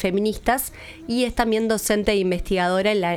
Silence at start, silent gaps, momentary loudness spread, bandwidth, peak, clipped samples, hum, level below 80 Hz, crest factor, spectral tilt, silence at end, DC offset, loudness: 0 s; none; 5 LU; 17.5 kHz; -4 dBFS; under 0.1%; none; -38 dBFS; 18 dB; -4.5 dB/octave; 0 s; under 0.1%; -22 LUFS